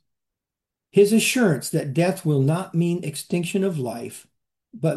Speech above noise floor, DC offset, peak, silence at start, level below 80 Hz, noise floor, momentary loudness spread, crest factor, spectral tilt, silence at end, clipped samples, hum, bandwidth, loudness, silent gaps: 66 dB; under 0.1%; -6 dBFS; 0.95 s; -68 dBFS; -87 dBFS; 12 LU; 18 dB; -5.5 dB/octave; 0 s; under 0.1%; none; 12.5 kHz; -22 LUFS; none